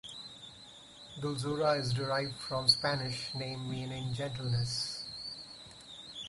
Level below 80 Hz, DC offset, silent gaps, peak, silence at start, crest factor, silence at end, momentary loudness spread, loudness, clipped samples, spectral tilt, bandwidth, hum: -62 dBFS; under 0.1%; none; -12 dBFS; 0.05 s; 24 dB; 0 s; 19 LU; -33 LUFS; under 0.1%; -4.5 dB/octave; 11.5 kHz; none